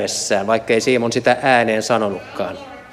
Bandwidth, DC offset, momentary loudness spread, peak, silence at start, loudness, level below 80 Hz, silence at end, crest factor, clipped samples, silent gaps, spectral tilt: 15.5 kHz; under 0.1%; 12 LU; -2 dBFS; 0 s; -17 LUFS; -56 dBFS; 0 s; 16 dB; under 0.1%; none; -3.5 dB/octave